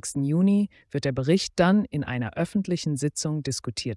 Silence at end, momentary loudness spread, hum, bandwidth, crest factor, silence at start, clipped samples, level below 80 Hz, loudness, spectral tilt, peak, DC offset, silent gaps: 0 s; 8 LU; none; 12 kHz; 16 dB; 0.05 s; under 0.1%; -56 dBFS; -25 LUFS; -5.5 dB/octave; -8 dBFS; under 0.1%; none